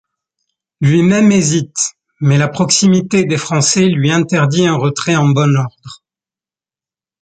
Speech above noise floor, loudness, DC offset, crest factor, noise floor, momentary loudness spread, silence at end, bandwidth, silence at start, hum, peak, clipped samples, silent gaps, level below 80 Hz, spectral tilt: over 78 dB; -13 LUFS; under 0.1%; 14 dB; under -90 dBFS; 7 LU; 1.3 s; 9.4 kHz; 0.8 s; none; 0 dBFS; under 0.1%; none; -52 dBFS; -5 dB/octave